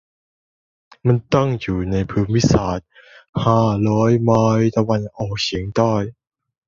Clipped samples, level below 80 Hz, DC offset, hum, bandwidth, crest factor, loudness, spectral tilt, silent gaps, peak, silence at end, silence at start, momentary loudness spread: under 0.1%; -40 dBFS; under 0.1%; none; 7.4 kHz; 16 dB; -18 LUFS; -7 dB/octave; 3.29-3.33 s; -2 dBFS; 0.55 s; 1.05 s; 8 LU